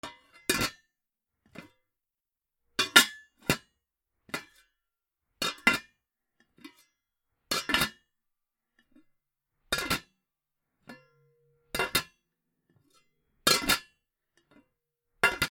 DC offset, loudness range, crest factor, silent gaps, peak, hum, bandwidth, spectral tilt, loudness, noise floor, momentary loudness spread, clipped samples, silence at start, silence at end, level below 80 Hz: under 0.1%; 9 LU; 34 dB; none; 0 dBFS; none; over 20 kHz; -1.5 dB/octave; -28 LUFS; -89 dBFS; 17 LU; under 0.1%; 0.05 s; 0.05 s; -58 dBFS